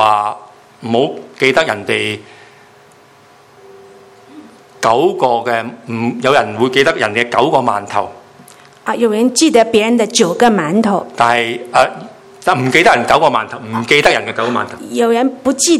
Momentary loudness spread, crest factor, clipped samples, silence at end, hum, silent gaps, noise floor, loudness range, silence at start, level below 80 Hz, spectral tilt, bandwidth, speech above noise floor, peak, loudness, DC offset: 10 LU; 14 dB; 0.2%; 0 s; none; none; -44 dBFS; 7 LU; 0 s; -52 dBFS; -3.5 dB/octave; 14.5 kHz; 31 dB; 0 dBFS; -13 LUFS; under 0.1%